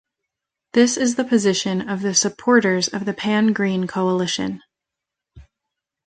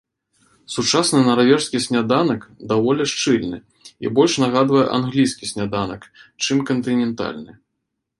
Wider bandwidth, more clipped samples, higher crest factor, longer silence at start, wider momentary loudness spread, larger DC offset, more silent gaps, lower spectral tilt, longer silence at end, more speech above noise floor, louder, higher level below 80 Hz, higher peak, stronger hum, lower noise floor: second, 9.4 kHz vs 11.5 kHz; neither; about the same, 18 dB vs 18 dB; about the same, 0.75 s vs 0.7 s; second, 7 LU vs 13 LU; neither; neither; about the same, -4 dB/octave vs -4.5 dB/octave; about the same, 0.65 s vs 0.7 s; first, 66 dB vs 58 dB; about the same, -19 LUFS vs -19 LUFS; about the same, -58 dBFS vs -56 dBFS; about the same, -2 dBFS vs 0 dBFS; neither; first, -84 dBFS vs -77 dBFS